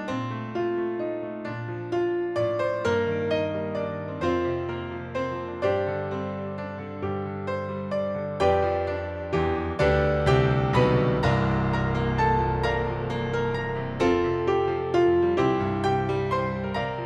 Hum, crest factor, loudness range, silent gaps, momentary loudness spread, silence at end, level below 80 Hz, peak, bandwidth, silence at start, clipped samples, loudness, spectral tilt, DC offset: none; 18 dB; 6 LU; none; 9 LU; 0 s; -42 dBFS; -8 dBFS; 9.8 kHz; 0 s; under 0.1%; -26 LUFS; -7.5 dB/octave; under 0.1%